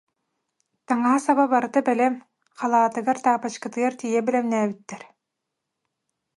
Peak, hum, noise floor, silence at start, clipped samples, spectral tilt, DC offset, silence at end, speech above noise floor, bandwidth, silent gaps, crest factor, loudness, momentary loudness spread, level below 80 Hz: -6 dBFS; none; -82 dBFS; 0.9 s; under 0.1%; -5 dB/octave; under 0.1%; 1.35 s; 60 dB; 11.5 kHz; none; 18 dB; -22 LUFS; 10 LU; -76 dBFS